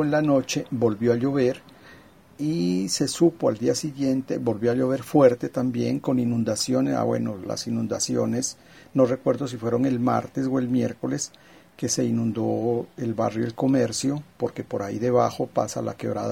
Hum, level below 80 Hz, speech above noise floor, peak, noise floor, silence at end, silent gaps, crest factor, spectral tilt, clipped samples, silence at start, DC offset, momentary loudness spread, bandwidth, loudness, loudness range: none; -62 dBFS; 27 dB; -4 dBFS; -50 dBFS; 0 s; none; 20 dB; -5.5 dB/octave; under 0.1%; 0 s; under 0.1%; 8 LU; 16 kHz; -24 LUFS; 3 LU